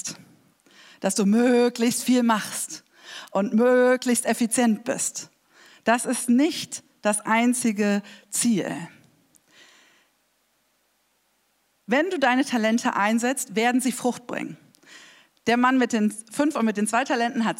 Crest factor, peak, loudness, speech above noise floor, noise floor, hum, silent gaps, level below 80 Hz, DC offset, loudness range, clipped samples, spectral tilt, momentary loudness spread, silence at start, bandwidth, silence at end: 18 dB; -6 dBFS; -23 LUFS; 46 dB; -68 dBFS; none; none; -80 dBFS; under 0.1%; 7 LU; under 0.1%; -4 dB/octave; 13 LU; 0.05 s; 16 kHz; 0.05 s